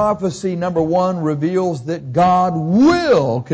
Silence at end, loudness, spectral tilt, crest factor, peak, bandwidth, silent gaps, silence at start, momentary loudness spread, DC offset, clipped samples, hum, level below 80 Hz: 0 s; -16 LUFS; -7 dB/octave; 10 dB; -6 dBFS; 8 kHz; none; 0 s; 8 LU; under 0.1%; under 0.1%; none; -46 dBFS